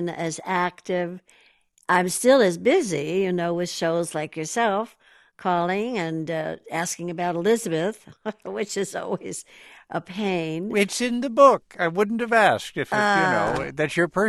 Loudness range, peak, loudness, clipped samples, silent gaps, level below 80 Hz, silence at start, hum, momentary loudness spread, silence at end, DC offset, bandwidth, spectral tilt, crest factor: 7 LU; -2 dBFS; -23 LUFS; under 0.1%; none; -60 dBFS; 0 s; none; 13 LU; 0 s; under 0.1%; 13 kHz; -4.5 dB/octave; 22 dB